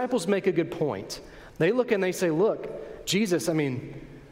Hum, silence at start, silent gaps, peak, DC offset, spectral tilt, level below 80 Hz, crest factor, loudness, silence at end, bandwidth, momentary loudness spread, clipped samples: none; 0 s; none; -10 dBFS; under 0.1%; -5 dB/octave; -56 dBFS; 18 dB; -26 LUFS; 0 s; 16 kHz; 14 LU; under 0.1%